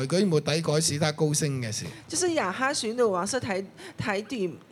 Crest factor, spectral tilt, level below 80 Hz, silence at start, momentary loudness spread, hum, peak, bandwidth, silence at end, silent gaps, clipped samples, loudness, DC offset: 18 dB; -4 dB/octave; -64 dBFS; 0 s; 8 LU; none; -10 dBFS; 14.5 kHz; 0.1 s; none; under 0.1%; -27 LUFS; under 0.1%